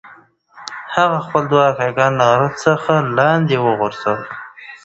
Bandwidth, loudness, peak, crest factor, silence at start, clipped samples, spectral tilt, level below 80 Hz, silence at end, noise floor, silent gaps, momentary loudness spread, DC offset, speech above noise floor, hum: 8.2 kHz; -16 LUFS; 0 dBFS; 16 dB; 0.05 s; under 0.1%; -6 dB/octave; -56 dBFS; 0.1 s; -46 dBFS; none; 17 LU; under 0.1%; 31 dB; none